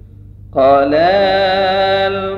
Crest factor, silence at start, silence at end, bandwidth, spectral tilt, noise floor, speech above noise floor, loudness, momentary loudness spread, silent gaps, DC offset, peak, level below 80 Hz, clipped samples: 12 dB; 0.5 s; 0 s; 6.4 kHz; -6.5 dB/octave; -36 dBFS; 24 dB; -12 LUFS; 4 LU; none; under 0.1%; -2 dBFS; -40 dBFS; under 0.1%